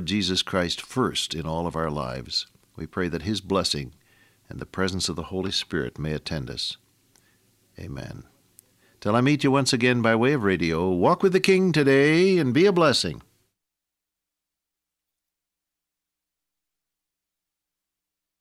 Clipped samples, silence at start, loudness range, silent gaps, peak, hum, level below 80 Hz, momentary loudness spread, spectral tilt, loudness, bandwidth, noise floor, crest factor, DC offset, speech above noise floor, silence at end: under 0.1%; 0 s; 11 LU; none; -4 dBFS; none; -52 dBFS; 18 LU; -5 dB/octave; -23 LUFS; 15 kHz; -86 dBFS; 22 dB; under 0.1%; 63 dB; 5.2 s